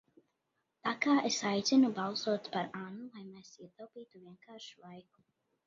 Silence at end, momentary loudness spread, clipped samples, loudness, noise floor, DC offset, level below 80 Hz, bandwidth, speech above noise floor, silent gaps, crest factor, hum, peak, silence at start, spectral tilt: 0.65 s; 25 LU; under 0.1%; -32 LUFS; -83 dBFS; under 0.1%; -82 dBFS; 7.4 kHz; 48 dB; none; 20 dB; none; -16 dBFS; 0.85 s; -3 dB/octave